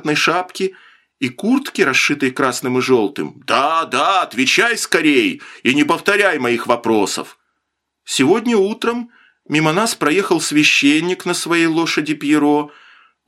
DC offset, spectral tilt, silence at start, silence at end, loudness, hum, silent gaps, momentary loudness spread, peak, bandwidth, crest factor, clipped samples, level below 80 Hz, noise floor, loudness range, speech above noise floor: under 0.1%; -3.5 dB/octave; 0.05 s; 0.55 s; -16 LUFS; none; none; 9 LU; 0 dBFS; 16 kHz; 16 dB; under 0.1%; -66 dBFS; -74 dBFS; 3 LU; 58 dB